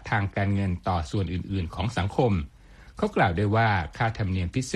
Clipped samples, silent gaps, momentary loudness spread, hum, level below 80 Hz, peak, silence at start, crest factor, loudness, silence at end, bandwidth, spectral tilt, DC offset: under 0.1%; none; 7 LU; none; -42 dBFS; -8 dBFS; 0 s; 18 dB; -26 LUFS; 0 s; 11 kHz; -6.5 dB/octave; under 0.1%